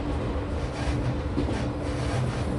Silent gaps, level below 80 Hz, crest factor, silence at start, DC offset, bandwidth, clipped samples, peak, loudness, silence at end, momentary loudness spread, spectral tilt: none; -34 dBFS; 14 dB; 0 s; under 0.1%; 11.5 kHz; under 0.1%; -14 dBFS; -29 LUFS; 0 s; 2 LU; -7 dB/octave